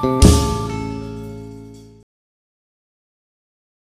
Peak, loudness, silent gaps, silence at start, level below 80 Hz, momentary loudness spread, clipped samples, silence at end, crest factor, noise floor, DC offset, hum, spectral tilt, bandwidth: 0 dBFS; -17 LUFS; none; 0 s; -26 dBFS; 23 LU; under 0.1%; 2 s; 20 dB; -39 dBFS; under 0.1%; none; -5.5 dB/octave; 15.5 kHz